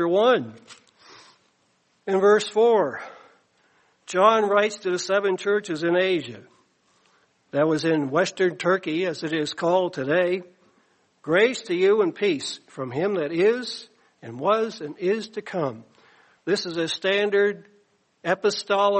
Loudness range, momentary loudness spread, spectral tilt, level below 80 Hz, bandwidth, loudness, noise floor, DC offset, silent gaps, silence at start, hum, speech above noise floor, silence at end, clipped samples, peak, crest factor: 4 LU; 13 LU; -4.5 dB/octave; -74 dBFS; 8.8 kHz; -23 LUFS; -67 dBFS; under 0.1%; none; 0 s; none; 44 dB; 0 s; under 0.1%; -4 dBFS; 20 dB